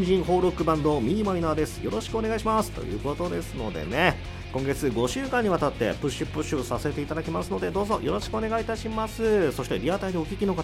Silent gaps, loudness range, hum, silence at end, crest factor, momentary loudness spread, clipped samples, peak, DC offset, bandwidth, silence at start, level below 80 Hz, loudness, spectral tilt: none; 2 LU; none; 0 s; 20 dB; 7 LU; under 0.1%; -6 dBFS; under 0.1%; 16 kHz; 0 s; -40 dBFS; -27 LUFS; -6 dB/octave